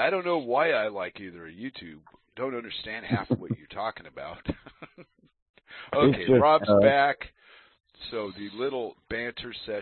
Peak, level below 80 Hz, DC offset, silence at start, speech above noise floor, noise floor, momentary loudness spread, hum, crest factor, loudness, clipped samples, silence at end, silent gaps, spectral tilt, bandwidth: -8 dBFS; -56 dBFS; under 0.1%; 0 s; 28 dB; -55 dBFS; 22 LU; none; 20 dB; -26 LUFS; under 0.1%; 0 s; 5.42-5.54 s; -10 dB/octave; 4.4 kHz